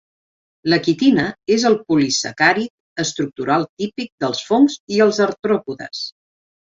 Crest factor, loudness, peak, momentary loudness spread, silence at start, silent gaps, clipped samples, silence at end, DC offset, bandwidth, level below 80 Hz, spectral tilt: 18 dB; -18 LUFS; -2 dBFS; 11 LU; 0.65 s; 2.70-2.96 s, 3.69-3.77 s, 4.12-4.18 s, 4.80-4.87 s; under 0.1%; 0.65 s; under 0.1%; 8 kHz; -60 dBFS; -4 dB/octave